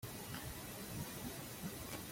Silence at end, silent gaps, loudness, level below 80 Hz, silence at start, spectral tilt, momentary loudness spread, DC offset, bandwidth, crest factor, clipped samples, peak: 0 s; none; -47 LUFS; -62 dBFS; 0 s; -4 dB/octave; 1 LU; under 0.1%; 16.5 kHz; 16 dB; under 0.1%; -32 dBFS